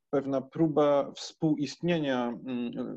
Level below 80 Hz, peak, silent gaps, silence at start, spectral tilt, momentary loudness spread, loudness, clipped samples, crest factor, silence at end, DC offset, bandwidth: -68 dBFS; -14 dBFS; none; 0.1 s; -6.5 dB/octave; 9 LU; -29 LUFS; under 0.1%; 16 dB; 0 s; under 0.1%; 8.2 kHz